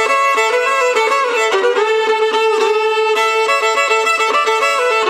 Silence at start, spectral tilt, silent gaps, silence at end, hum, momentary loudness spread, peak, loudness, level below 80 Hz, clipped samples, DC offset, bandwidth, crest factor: 0 s; 0.5 dB/octave; none; 0 s; none; 1 LU; 0 dBFS; -13 LUFS; -66 dBFS; under 0.1%; under 0.1%; 15.5 kHz; 14 dB